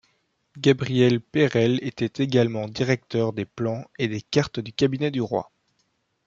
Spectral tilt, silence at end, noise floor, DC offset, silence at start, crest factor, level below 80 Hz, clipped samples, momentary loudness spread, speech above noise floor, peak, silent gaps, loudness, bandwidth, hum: -6.5 dB/octave; 0.85 s; -71 dBFS; under 0.1%; 0.55 s; 20 dB; -60 dBFS; under 0.1%; 8 LU; 48 dB; -4 dBFS; none; -24 LUFS; 7.6 kHz; none